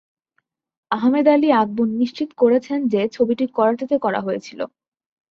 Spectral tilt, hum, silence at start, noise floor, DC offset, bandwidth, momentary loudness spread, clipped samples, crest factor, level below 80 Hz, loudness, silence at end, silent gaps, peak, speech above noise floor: -7 dB/octave; none; 0.9 s; -71 dBFS; under 0.1%; 7.2 kHz; 11 LU; under 0.1%; 16 dB; -66 dBFS; -19 LUFS; 0.65 s; none; -4 dBFS; 53 dB